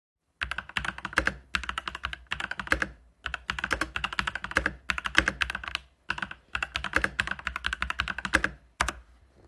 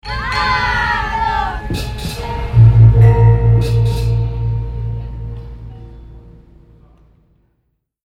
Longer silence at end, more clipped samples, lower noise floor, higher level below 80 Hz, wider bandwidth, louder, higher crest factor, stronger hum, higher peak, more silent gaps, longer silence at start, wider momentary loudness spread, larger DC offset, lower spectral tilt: second, 0.45 s vs 1.75 s; neither; second, -54 dBFS vs -67 dBFS; second, -44 dBFS vs -24 dBFS; first, 12.5 kHz vs 10.5 kHz; second, -30 LUFS vs -14 LUFS; first, 32 dB vs 14 dB; neither; about the same, -2 dBFS vs 0 dBFS; neither; first, 0.4 s vs 0.05 s; second, 8 LU vs 20 LU; neither; second, -2.5 dB/octave vs -7 dB/octave